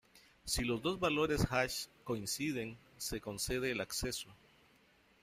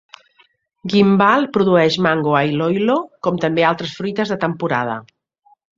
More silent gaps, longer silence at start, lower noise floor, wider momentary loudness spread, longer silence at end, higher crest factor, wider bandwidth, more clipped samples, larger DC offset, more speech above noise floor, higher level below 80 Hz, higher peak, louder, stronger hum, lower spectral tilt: neither; second, 0.15 s vs 0.85 s; first, -69 dBFS vs -57 dBFS; about the same, 10 LU vs 9 LU; first, 0.9 s vs 0.75 s; about the same, 20 dB vs 16 dB; first, 16 kHz vs 7.6 kHz; neither; neither; second, 31 dB vs 41 dB; about the same, -54 dBFS vs -58 dBFS; second, -18 dBFS vs -2 dBFS; second, -37 LUFS vs -17 LUFS; neither; second, -3.5 dB/octave vs -6.5 dB/octave